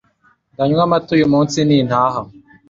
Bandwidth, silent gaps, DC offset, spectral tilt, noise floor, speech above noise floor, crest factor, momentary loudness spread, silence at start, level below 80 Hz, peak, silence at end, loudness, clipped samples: 7.6 kHz; none; under 0.1%; -6.5 dB/octave; -57 dBFS; 43 dB; 16 dB; 8 LU; 0.6 s; -50 dBFS; 0 dBFS; 0.4 s; -15 LUFS; under 0.1%